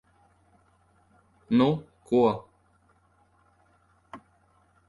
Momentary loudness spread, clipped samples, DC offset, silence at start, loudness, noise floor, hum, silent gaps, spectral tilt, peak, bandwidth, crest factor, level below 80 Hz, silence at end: 26 LU; under 0.1%; under 0.1%; 1.5 s; -26 LUFS; -65 dBFS; none; none; -8.5 dB/octave; -10 dBFS; 11.5 kHz; 20 dB; -64 dBFS; 0.7 s